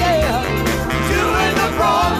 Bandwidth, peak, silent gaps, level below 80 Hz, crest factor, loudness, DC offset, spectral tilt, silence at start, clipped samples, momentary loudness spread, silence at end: 16 kHz; -6 dBFS; none; -28 dBFS; 12 dB; -17 LUFS; under 0.1%; -4.5 dB/octave; 0 s; under 0.1%; 3 LU; 0 s